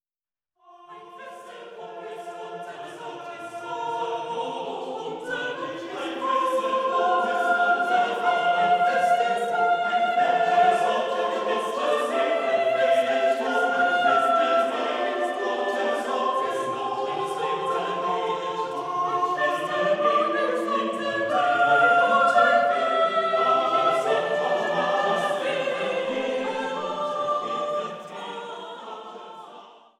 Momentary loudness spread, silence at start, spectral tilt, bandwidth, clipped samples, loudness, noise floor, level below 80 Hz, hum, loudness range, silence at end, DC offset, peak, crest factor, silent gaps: 17 LU; 0.8 s; -3.5 dB/octave; 12.5 kHz; under 0.1%; -23 LUFS; under -90 dBFS; -76 dBFS; none; 11 LU; 0.25 s; under 0.1%; -6 dBFS; 18 dB; none